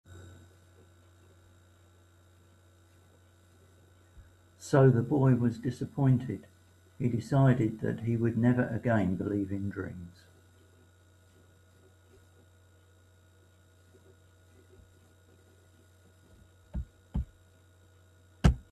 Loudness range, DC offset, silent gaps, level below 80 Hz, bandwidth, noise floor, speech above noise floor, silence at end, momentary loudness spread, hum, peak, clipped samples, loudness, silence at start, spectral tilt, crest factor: 17 LU; under 0.1%; none; -46 dBFS; 11.5 kHz; -61 dBFS; 33 dB; 0.1 s; 19 LU; none; -8 dBFS; under 0.1%; -29 LUFS; 0.1 s; -8.5 dB/octave; 26 dB